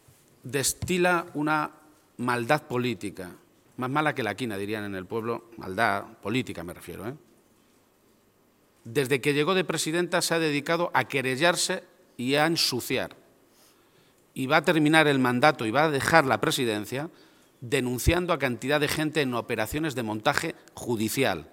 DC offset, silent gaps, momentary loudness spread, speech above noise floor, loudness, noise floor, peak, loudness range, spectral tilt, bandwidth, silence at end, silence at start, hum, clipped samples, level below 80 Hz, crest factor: under 0.1%; none; 14 LU; 37 dB; -26 LUFS; -63 dBFS; -2 dBFS; 8 LU; -4 dB/octave; 17 kHz; 0.05 s; 0.45 s; none; under 0.1%; -50 dBFS; 26 dB